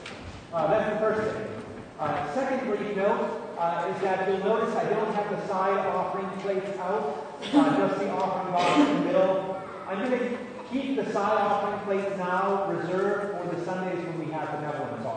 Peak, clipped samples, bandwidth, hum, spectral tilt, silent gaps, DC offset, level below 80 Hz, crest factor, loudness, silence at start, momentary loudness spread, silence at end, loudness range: -8 dBFS; under 0.1%; 9.6 kHz; none; -6 dB/octave; none; under 0.1%; -62 dBFS; 18 dB; -27 LUFS; 0 s; 9 LU; 0 s; 3 LU